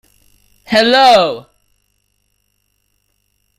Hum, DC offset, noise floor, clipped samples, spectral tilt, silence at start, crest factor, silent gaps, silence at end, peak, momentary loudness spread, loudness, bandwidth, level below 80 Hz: 50 Hz at -60 dBFS; under 0.1%; -64 dBFS; under 0.1%; -3.5 dB/octave; 0.7 s; 16 dB; none; 2.2 s; 0 dBFS; 12 LU; -10 LUFS; 16 kHz; -54 dBFS